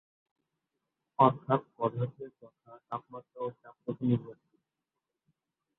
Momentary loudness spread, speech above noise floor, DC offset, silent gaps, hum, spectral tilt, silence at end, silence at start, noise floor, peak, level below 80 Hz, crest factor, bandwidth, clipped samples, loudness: 22 LU; 56 dB; under 0.1%; none; none; -11 dB/octave; 1.45 s; 1.2 s; -88 dBFS; -8 dBFS; -72 dBFS; 26 dB; 4.1 kHz; under 0.1%; -32 LUFS